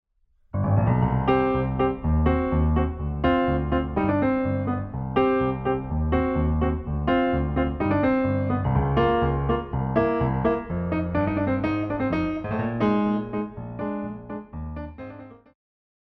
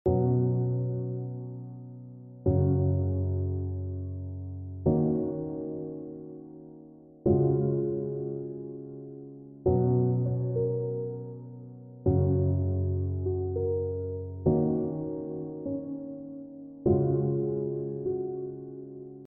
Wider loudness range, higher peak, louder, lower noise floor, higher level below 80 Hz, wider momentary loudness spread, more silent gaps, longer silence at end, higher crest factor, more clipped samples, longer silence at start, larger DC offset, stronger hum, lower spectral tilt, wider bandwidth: about the same, 4 LU vs 3 LU; first, -8 dBFS vs -12 dBFS; first, -24 LUFS vs -30 LUFS; first, -62 dBFS vs -51 dBFS; first, -34 dBFS vs -50 dBFS; second, 11 LU vs 18 LU; neither; first, 0.7 s vs 0 s; about the same, 16 dB vs 16 dB; neither; first, 0.55 s vs 0.05 s; neither; neither; second, -10.5 dB/octave vs -13.5 dB/octave; first, 5.4 kHz vs 1.6 kHz